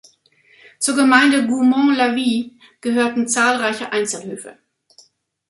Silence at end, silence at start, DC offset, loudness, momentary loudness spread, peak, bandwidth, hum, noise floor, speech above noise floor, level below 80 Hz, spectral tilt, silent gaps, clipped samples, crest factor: 0.95 s; 0.8 s; under 0.1%; -17 LUFS; 15 LU; -2 dBFS; 11.5 kHz; none; -55 dBFS; 38 dB; -66 dBFS; -2.5 dB/octave; none; under 0.1%; 18 dB